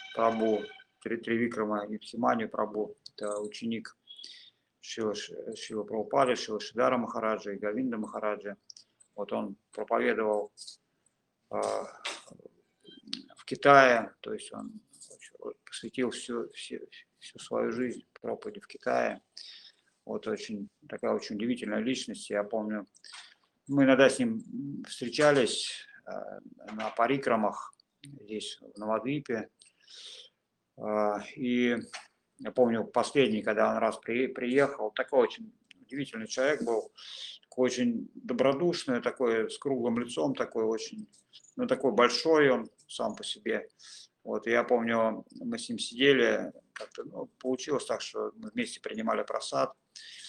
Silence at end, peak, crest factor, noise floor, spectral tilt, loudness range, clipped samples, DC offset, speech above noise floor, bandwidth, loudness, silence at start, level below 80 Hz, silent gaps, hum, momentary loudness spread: 0 s; -6 dBFS; 26 dB; -75 dBFS; -4.5 dB/octave; 8 LU; under 0.1%; under 0.1%; 45 dB; 11.5 kHz; -30 LUFS; 0 s; -76 dBFS; none; none; 20 LU